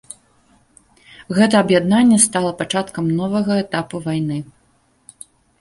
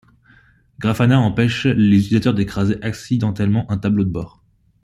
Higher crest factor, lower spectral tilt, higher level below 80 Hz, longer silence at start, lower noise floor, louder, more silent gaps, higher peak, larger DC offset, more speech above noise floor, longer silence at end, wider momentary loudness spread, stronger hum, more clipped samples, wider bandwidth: about the same, 18 dB vs 16 dB; second, -4.5 dB/octave vs -7.5 dB/octave; second, -56 dBFS vs -46 dBFS; first, 1.3 s vs 0.8 s; first, -59 dBFS vs -52 dBFS; about the same, -17 LUFS vs -18 LUFS; neither; about the same, 0 dBFS vs -2 dBFS; neither; first, 42 dB vs 35 dB; first, 1.15 s vs 0.55 s; about the same, 11 LU vs 9 LU; neither; neither; about the same, 11.5 kHz vs 12 kHz